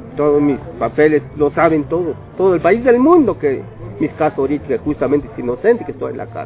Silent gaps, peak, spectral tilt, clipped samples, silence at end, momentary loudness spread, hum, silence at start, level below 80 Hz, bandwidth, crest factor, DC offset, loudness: none; 0 dBFS; -11.5 dB/octave; under 0.1%; 0 s; 12 LU; none; 0 s; -42 dBFS; 4 kHz; 16 dB; under 0.1%; -16 LUFS